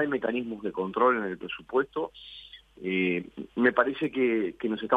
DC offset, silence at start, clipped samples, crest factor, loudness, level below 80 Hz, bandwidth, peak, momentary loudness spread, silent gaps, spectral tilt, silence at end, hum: under 0.1%; 0 s; under 0.1%; 20 dB; -28 LUFS; -64 dBFS; 4.9 kHz; -8 dBFS; 13 LU; none; -7.5 dB/octave; 0 s; none